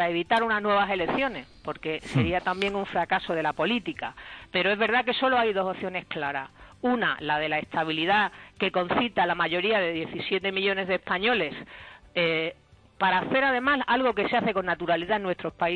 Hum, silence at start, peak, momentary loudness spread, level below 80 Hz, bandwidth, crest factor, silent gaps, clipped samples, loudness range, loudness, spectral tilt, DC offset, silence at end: none; 0 s; -10 dBFS; 9 LU; -56 dBFS; 10.5 kHz; 16 dB; none; under 0.1%; 2 LU; -26 LUFS; -6 dB/octave; under 0.1%; 0 s